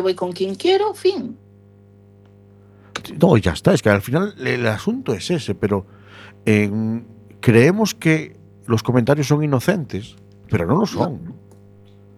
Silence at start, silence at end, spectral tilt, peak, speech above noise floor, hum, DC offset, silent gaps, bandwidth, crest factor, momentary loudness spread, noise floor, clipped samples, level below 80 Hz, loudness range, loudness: 0 s; 0.8 s; -6.5 dB/octave; 0 dBFS; 29 dB; 50 Hz at -40 dBFS; under 0.1%; none; 15.5 kHz; 20 dB; 15 LU; -48 dBFS; under 0.1%; -48 dBFS; 3 LU; -19 LUFS